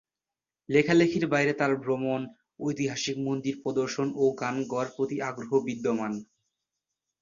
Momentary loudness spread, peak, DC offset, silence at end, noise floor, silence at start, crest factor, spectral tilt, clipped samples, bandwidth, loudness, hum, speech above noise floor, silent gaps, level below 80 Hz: 10 LU; -8 dBFS; under 0.1%; 1 s; under -90 dBFS; 0.7 s; 20 dB; -5.5 dB/octave; under 0.1%; 7.4 kHz; -28 LUFS; none; over 63 dB; none; -68 dBFS